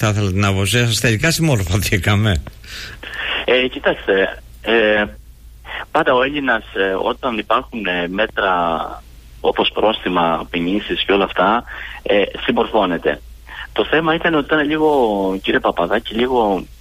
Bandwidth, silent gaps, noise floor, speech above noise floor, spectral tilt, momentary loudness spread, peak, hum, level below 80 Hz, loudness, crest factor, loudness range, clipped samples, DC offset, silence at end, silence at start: 15.5 kHz; none; -39 dBFS; 22 dB; -5 dB/octave; 10 LU; -6 dBFS; none; -38 dBFS; -17 LUFS; 12 dB; 2 LU; under 0.1%; under 0.1%; 0.05 s; 0 s